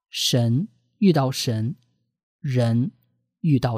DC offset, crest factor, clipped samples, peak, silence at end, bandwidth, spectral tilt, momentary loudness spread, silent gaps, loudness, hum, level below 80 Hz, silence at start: under 0.1%; 16 dB; under 0.1%; -6 dBFS; 0 s; 15.5 kHz; -6 dB/octave; 12 LU; 2.23-2.39 s; -23 LUFS; none; -60 dBFS; 0.15 s